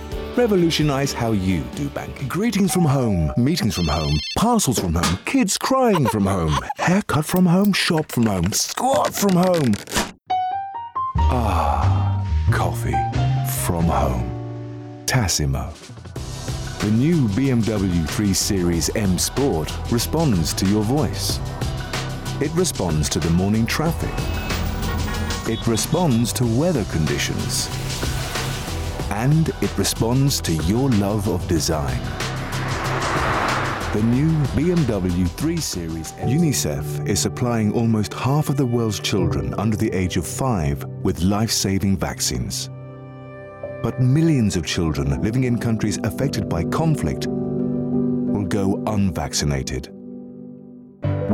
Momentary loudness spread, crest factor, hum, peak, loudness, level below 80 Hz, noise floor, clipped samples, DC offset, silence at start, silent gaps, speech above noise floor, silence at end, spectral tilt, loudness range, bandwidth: 9 LU; 12 dB; none; -8 dBFS; -21 LUFS; -34 dBFS; -41 dBFS; under 0.1%; under 0.1%; 0 s; none; 21 dB; 0 s; -5 dB/octave; 3 LU; 18 kHz